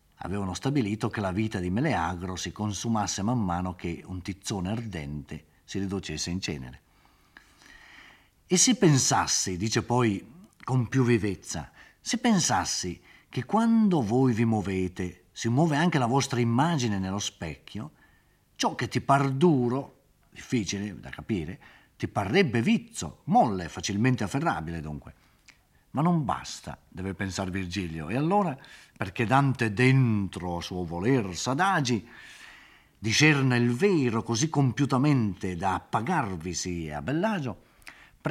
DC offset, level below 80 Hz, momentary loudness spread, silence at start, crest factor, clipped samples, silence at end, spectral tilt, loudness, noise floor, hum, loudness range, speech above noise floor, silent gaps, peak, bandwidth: under 0.1%; -58 dBFS; 15 LU; 0.2 s; 22 dB; under 0.1%; 0 s; -5 dB/octave; -27 LUFS; -63 dBFS; none; 7 LU; 36 dB; none; -6 dBFS; 15 kHz